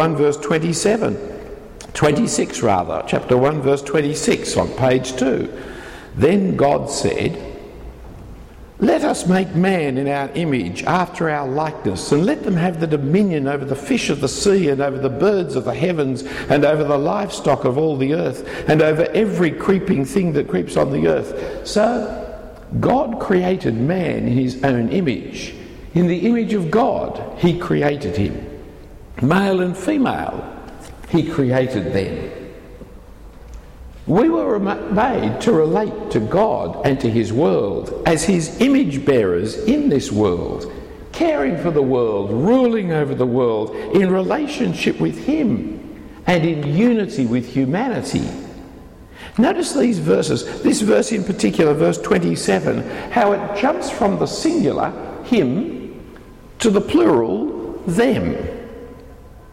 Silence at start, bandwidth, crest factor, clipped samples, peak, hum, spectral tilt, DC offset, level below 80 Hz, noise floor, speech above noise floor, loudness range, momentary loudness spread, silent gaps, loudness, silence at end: 0 s; 15.5 kHz; 14 dB; under 0.1%; -4 dBFS; none; -6 dB/octave; under 0.1%; -42 dBFS; -40 dBFS; 22 dB; 3 LU; 14 LU; none; -18 LUFS; 0 s